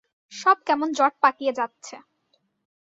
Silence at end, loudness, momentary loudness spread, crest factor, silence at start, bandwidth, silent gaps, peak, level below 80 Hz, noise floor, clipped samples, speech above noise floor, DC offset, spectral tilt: 0.9 s; -22 LUFS; 22 LU; 22 dB; 0.3 s; 7.8 kHz; none; -4 dBFS; -76 dBFS; -70 dBFS; under 0.1%; 48 dB; under 0.1%; -2 dB/octave